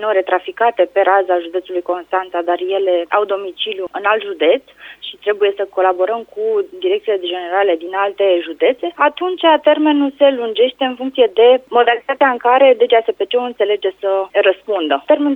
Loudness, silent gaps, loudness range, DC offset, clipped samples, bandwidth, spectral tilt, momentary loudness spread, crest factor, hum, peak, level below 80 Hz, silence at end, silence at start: -15 LUFS; none; 5 LU; under 0.1%; under 0.1%; 4 kHz; -5 dB/octave; 8 LU; 14 dB; none; 0 dBFS; -66 dBFS; 0 s; 0 s